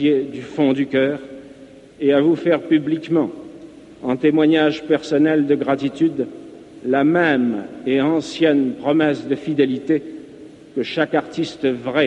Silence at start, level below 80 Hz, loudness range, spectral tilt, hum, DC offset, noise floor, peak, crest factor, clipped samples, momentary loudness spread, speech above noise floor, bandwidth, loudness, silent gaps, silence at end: 0 s; -62 dBFS; 2 LU; -6.5 dB/octave; none; under 0.1%; -42 dBFS; -4 dBFS; 14 dB; under 0.1%; 13 LU; 24 dB; 8.8 kHz; -19 LUFS; none; 0 s